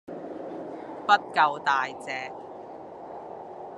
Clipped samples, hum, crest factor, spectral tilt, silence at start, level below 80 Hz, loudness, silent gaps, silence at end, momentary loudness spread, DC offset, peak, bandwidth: under 0.1%; none; 24 dB; -3.5 dB/octave; 0.05 s; -74 dBFS; -27 LUFS; none; 0 s; 19 LU; under 0.1%; -6 dBFS; 11 kHz